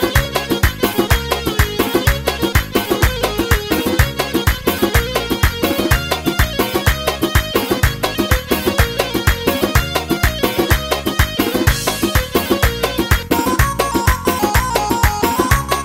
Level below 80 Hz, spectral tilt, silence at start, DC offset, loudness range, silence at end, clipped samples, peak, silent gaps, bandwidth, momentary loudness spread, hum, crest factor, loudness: -22 dBFS; -4.5 dB/octave; 0 s; under 0.1%; 1 LU; 0 s; under 0.1%; 0 dBFS; none; 16.5 kHz; 2 LU; none; 16 dB; -16 LUFS